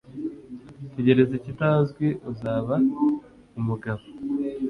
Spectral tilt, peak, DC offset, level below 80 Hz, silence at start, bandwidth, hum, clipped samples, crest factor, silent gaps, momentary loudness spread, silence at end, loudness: -9.5 dB/octave; -6 dBFS; under 0.1%; -58 dBFS; 0.1 s; 5.2 kHz; none; under 0.1%; 20 dB; none; 16 LU; 0 s; -25 LUFS